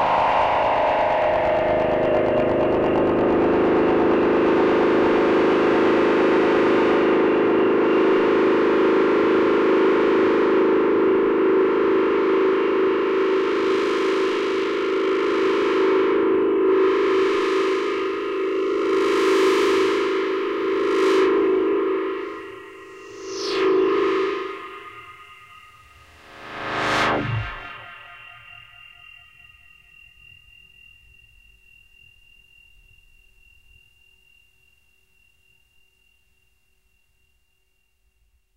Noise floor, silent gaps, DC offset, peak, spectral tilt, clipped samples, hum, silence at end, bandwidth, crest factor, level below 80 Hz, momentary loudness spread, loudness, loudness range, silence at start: -69 dBFS; none; under 0.1%; -8 dBFS; -6 dB/octave; under 0.1%; none; 10 s; 10 kHz; 12 dB; -50 dBFS; 12 LU; -19 LUFS; 9 LU; 0 s